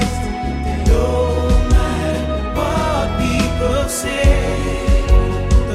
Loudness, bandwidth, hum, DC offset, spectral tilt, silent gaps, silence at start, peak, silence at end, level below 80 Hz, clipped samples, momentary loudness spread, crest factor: -17 LUFS; 14.5 kHz; none; under 0.1%; -6 dB/octave; none; 0 s; 0 dBFS; 0 s; -18 dBFS; under 0.1%; 5 LU; 14 dB